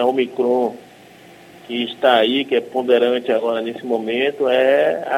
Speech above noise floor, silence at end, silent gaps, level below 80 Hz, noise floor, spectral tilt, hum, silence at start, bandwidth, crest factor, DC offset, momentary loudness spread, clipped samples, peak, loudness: 26 dB; 0 s; none; -68 dBFS; -44 dBFS; -5 dB/octave; none; 0 s; 15.5 kHz; 18 dB; under 0.1%; 9 LU; under 0.1%; 0 dBFS; -18 LUFS